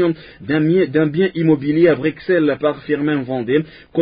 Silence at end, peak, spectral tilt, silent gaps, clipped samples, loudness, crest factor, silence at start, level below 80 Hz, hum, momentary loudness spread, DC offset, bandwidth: 0 s; -2 dBFS; -12.5 dB/octave; none; under 0.1%; -17 LUFS; 14 dB; 0 s; -54 dBFS; none; 6 LU; under 0.1%; 5.2 kHz